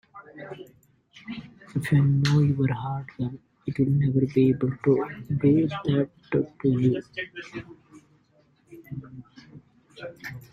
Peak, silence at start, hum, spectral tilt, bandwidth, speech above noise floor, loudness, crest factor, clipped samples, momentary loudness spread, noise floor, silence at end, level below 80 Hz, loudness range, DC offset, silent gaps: -8 dBFS; 0.15 s; none; -8.5 dB/octave; 10.5 kHz; 38 dB; -25 LUFS; 18 dB; under 0.1%; 20 LU; -63 dBFS; 0.1 s; -56 dBFS; 9 LU; under 0.1%; none